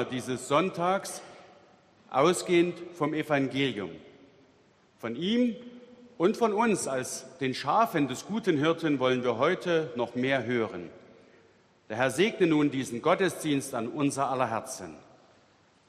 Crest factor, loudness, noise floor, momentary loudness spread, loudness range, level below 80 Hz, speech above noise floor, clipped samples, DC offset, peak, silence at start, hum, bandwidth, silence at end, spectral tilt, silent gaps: 20 dB; -28 LUFS; -63 dBFS; 13 LU; 3 LU; -70 dBFS; 35 dB; under 0.1%; under 0.1%; -8 dBFS; 0 s; none; 14 kHz; 0.9 s; -5 dB/octave; none